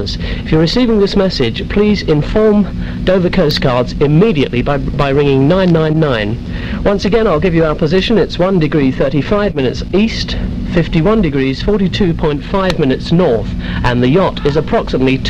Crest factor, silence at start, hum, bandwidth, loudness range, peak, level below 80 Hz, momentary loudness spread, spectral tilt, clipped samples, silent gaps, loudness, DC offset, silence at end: 12 dB; 0 s; none; 9 kHz; 2 LU; 0 dBFS; -24 dBFS; 6 LU; -7.5 dB/octave; under 0.1%; none; -13 LUFS; 0.5%; 0 s